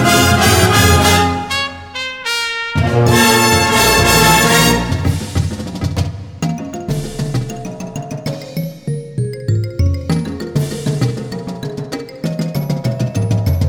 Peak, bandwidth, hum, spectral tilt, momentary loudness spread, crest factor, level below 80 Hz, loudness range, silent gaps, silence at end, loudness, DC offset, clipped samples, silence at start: 0 dBFS; 20 kHz; none; -4 dB/octave; 15 LU; 14 dB; -30 dBFS; 11 LU; none; 0 s; -15 LUFS; under 0.1%; under 0.1%; 0 s